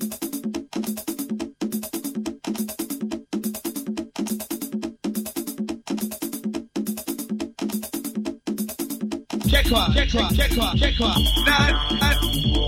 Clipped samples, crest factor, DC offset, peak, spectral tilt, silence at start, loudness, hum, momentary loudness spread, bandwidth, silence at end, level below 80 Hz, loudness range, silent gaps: under 0.1%; 20 dB; under 0.1%; -4 dBFS; -4 dB/octave; 0 s; -24 LUFS; none; 11 LU; 16.5 kHz; 0 s; -30 dBFS; 9 LU; none